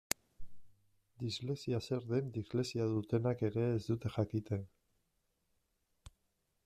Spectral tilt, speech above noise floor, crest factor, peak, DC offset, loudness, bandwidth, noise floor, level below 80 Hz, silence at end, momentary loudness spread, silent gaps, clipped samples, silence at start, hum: -6 dB/octave; 45 dB; 28 dB; -10 dBFS; under 0.1%; -38 LUFS; 14 kHz; -81 dBFS; -66 dBFS; 0.55 s; 7 LU; none; under 0.1%; 0.4 s; none